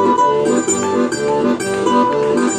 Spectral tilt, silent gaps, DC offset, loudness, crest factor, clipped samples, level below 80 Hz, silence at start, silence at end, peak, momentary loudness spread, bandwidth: -4 dB/octave; none; under 0.1%; -15 LUFS; 12 dB; under 0.1%; -52 dBFS; 0 s; 0 s; -2 dBFS; 3 LU; 14.5 kHz